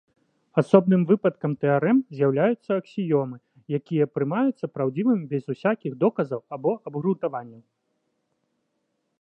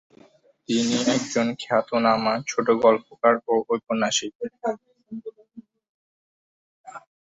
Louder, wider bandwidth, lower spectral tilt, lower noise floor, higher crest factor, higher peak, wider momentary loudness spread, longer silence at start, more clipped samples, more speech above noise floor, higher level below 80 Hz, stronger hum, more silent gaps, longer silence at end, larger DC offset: about the same, -24 LUFS vs -23 LUFS; about the same, 8.8 kHz vs 8 kHz; first, -9.5 dB/octave vs -3.5 dB/octave; first, -75 dBFS vs -55 dBFS; about the same, 22 dB vs 20 dB; about the same, -2 dBFS vs -4 dBFS; second, 10 LU vs 18 LU; second, 0.55 s vs 0.7 s; neither; first, 52 dB vs 33 dB; second, -74 dBFS vs -68 dBFS; neither; second, none vs 4.35-4.40 s, 5.89-6.84 s; first, 1.6 s vs 0.4 s; neither